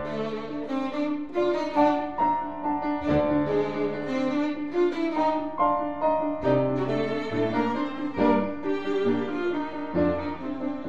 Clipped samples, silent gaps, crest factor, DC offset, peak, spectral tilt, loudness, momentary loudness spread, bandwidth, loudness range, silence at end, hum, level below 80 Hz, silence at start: under 0.1%; none; 16 dB; 0.8%; -10 dBFS; -7.5 dB/octave; -26 LUFS; 7 LU; 7.6 kHz; 1 LU; 0 s; none; -54 dBFS; 0 s